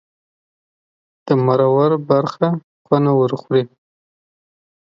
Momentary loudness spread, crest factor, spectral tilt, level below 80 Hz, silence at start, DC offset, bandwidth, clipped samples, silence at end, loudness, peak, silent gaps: 6 LU; 18 dB; -9 dB/octave; -64 dBFS; 1.25 s; under 0.1%; 7.2 kHz; under 0.1%; 1.2 s; -17 LUFS; 0 dBFS; 2.63-2.85 s